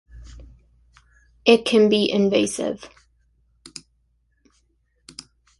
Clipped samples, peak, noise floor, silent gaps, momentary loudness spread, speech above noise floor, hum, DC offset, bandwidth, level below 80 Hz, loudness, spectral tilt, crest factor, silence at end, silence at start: under 0.1%; -2 dBFS; -66 dBFS; none; 25 LU; 48 dB; none; under 0.1%; 11.5 kHz; -52 dBFS; -19 LUFS; -4.5 dB/octave; 22 dB; 2.75 s; 0.15 s